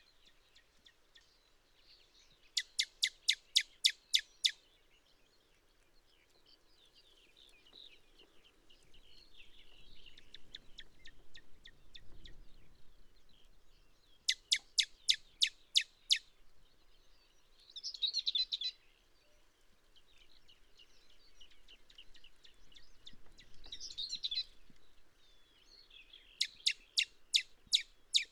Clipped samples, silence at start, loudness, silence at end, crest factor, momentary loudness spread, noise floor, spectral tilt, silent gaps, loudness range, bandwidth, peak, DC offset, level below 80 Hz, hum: under 0.1%; 2.55 s; -35 LUFS; 0.05 s; 28 dB; 26 LU; -70 dBFS; 3 dB/octave; none; 23 LU; 19.5 kHz; -14 dBFS; under 0.1%; -66 dBFS; none